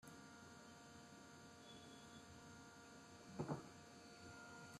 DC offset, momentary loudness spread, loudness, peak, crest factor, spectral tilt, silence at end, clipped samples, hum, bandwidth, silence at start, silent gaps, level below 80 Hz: under 0.1%; 11 LU; -58 LUFS; -32 dBFS; 26 dB; -5 dB/octave; 0 s; under 0.1%; none; 13.5 kHz; 0 s; none; -82 dBFS